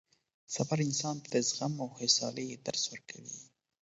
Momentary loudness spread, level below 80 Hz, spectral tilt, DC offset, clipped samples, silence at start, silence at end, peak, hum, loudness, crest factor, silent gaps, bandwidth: 16 LU; -76 dBFS; -4 dB/octave; under 0.1%; under 0.1%; 0.5 s; 0.35 s; -12 dBFS; none; -33 LUFS; 24 dB; none; 8 kHz